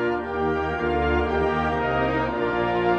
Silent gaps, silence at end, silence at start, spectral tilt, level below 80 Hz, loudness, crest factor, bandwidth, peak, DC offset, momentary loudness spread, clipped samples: none; 0 s; 0 s; -7.5 dB/octave; -36 dBFS; -24 LUFS; 14 dB; 8 kHz; -10 dBFS; under 0.1%; 2 LU; under 0.1%